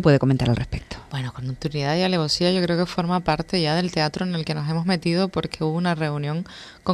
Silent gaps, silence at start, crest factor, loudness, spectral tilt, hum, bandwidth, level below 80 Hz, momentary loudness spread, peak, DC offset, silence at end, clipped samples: none; 0 s; 18 dB; -23 LUFS; -6 dB/octave; none; 12 kHz; -44 dBFS; 10 LU; -4 dBFS; under 0.1%; 0 s; under 0.1%